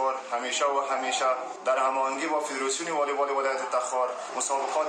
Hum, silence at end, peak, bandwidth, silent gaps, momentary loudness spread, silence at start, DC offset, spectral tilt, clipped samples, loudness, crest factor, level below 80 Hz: none; 0 s; -14 dBFS; 12.5 kHz; none; 3 LU; 0 s; under 0.1%; -0.5 dB/octave; under 0.1%; -27 LUFS; 14 dB; under -90 dBFS